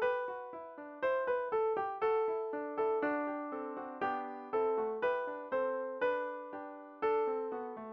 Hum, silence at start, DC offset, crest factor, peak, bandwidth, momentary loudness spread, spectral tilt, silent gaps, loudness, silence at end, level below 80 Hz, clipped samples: none; 0 s; under 0.1%; 14 dB; -22 dBFS; 5.4 kHz; 10 LU; -2.5 dB/octave; none; -36 LUFS; 0 s; -76 dBFS; under 0.1%